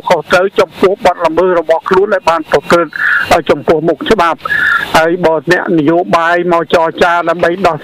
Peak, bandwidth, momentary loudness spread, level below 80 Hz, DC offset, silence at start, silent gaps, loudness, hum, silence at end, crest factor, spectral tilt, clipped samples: -2 dBFS; 16 kHz; 2 LU; -40 dBFS; under 0.1%; 0.05 s; none; -10 LUFS; none; 0 s; 8 dB; -5 dB/octave; under 0.1%